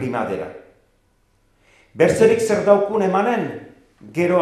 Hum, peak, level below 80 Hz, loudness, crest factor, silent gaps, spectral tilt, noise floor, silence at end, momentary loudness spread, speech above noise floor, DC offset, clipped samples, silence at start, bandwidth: none; 0 dBFS; -56 dBFS; -18 LUFS; 20 dB; none; -6 dB/octave; -61 dBFS; 0 s; 15 LU; 44 dB; under 0.1%; under 0.1%; 0 s; 14 kHz